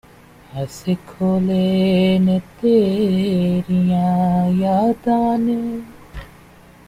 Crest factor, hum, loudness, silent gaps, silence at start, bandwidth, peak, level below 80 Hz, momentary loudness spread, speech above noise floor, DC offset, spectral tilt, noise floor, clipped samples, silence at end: 14 dB; none; -18 LUFS; none; 0.55 s; 11 kHz; -4 dBFS; -46 dBFS; 14 LU; 28 dB; under 0.1%; -8 dB/octave; -45 dBFS; under 0.1%; 0.6 s